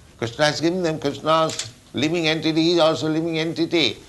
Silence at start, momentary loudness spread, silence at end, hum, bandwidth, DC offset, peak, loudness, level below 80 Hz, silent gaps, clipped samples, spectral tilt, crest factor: 0.2 s; 7 LU; 0.05 s; none; 12 kHz; under 0.1%; -4 dBFS; -21 LUFS; -56 dBFS; none; under 0.1%; -4.5 dB/octave; 16 dB